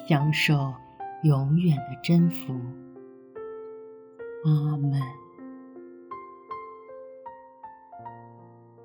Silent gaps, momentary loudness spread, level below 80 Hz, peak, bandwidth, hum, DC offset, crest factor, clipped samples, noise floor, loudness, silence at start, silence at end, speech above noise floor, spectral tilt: none; 23 LU; -64 dBFS; -8 dBFS; over 20 kHz; none; under 0.1%; 20 dB; under 0.1%; -50 dBFS; -25 LUFS; 0 s; 0.4 s; 27 dB; -7 dB/octave